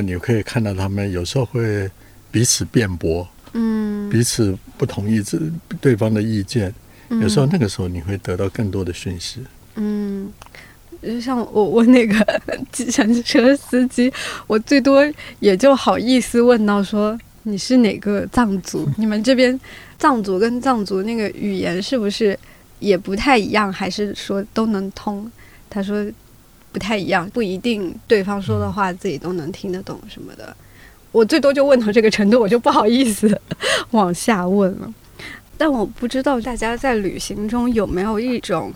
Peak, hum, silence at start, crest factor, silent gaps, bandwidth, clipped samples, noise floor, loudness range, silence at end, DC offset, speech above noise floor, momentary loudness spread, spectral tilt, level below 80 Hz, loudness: -2 dBFS; none; 0 s; 16 dB; none; 16.5 kHz; under 0.1%; -47 dBFS; 7 LU; 0 s; under 0.1%; 29 dB; 13 LU; -5.5 dB/octave; -44 dBFS; -18 LUFS